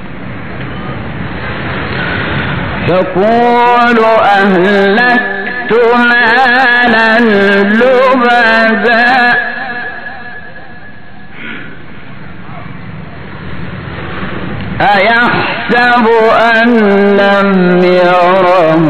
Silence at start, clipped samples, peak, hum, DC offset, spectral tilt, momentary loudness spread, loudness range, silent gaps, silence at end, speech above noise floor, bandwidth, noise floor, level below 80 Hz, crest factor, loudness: 0 s; 0.2%; 0 dBFS; none; 5%; -7 dB/octave; 19 LU; 18 LU; none; 0 s; 25 dB; 10.5 kHz; -32 dBFS; -38 dBFS; 10 dB; -8 LUFS